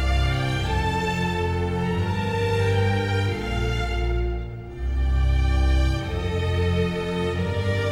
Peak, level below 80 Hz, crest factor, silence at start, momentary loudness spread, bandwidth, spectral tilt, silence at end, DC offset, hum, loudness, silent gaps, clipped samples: -10 dBFS; -26 dBFS; 12 dB; 0 s; 5 LU; 11.5 kHz; -6.5 dB/octave; 0 s; under 0.1%; none; -24 LUFS; none; under 0.1%